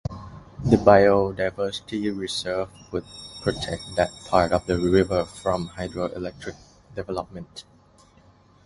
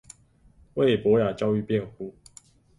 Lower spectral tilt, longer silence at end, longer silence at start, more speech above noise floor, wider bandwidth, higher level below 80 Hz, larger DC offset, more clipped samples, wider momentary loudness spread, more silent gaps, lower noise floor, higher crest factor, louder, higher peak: about the same, -6 dB/octave vs -7 dB/octave; first, 1.05 s vs 0.7 s; second, 0.1 s vs 0.75 s; about the same, 32 dB vs 34 dB; about the same, 11.5 kHz vs 11.5 kHz; first, -44 dBFS vs -58 dBFS; neither; neither; about the same, 20 LU vs 18 LU; neither; about the same, -55 dBFS vs -58 dBFS; first, 24 dB vs 18 dB; about the same, -24 LUFS vs -24 LUFS; first, 0 dBFS vs -10 dBFS